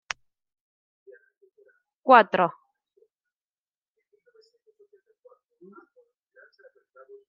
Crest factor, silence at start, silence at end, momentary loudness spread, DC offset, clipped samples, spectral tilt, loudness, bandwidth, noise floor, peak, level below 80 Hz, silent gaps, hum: 28 dB; 2.05 s; 4.8 s; 20 LU; under 0.1%; under 0.1%; -2.5 dB/octave; -21 LUFS; 7.2 kHz; under -90 dBFS; -2 dBFS; -80 dBFS; none; none